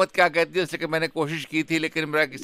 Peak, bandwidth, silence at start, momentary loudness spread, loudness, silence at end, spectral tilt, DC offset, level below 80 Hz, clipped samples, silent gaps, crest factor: -6 dBFS; 15.5 kHz; 0 s; 6 LU; -24 LUFS; 0 s; -4.5 dB/octave; under 0.1%; -66 dBFS; under 0.1%; none; 18 dB